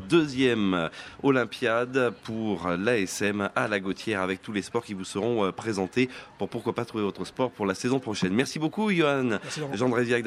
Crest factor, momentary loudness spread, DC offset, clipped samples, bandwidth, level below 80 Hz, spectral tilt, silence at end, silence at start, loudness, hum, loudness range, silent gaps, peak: 18 dB; 7 LU; under 0.1%; under 0.1%; 14 kHz; -64 dBFS; -5.5 dB/octave; 0 s; 0 s; -27 LUFS; none; 3 LU; none; -8 dBFS